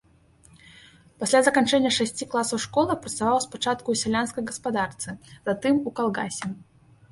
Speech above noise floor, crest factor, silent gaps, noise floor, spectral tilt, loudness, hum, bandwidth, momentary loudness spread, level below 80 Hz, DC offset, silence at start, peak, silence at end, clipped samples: 32 dB; 22 dB; none; -57 dBFS; -3.5 dB/octave; -25 LUFS; none; 11.5 kHz; 12 LU; -60 dBFS; under 0.1%; 1.2 s; -4 dBFS; 0.5 s; under 0.1%